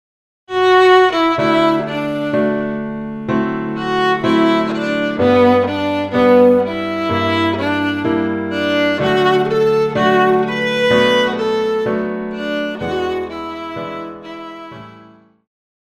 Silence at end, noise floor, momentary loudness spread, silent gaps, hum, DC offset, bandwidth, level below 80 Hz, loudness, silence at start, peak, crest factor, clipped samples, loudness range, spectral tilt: 0.9 s; -45 dBFS; 14 LU; none; none; under 0.1%; 13.5 kHz; -50 dBFS; -15 LUFS; 0.5 s; -2 dBFS; 14 dB; under 0.1%; 8 LU; -6 dB/octave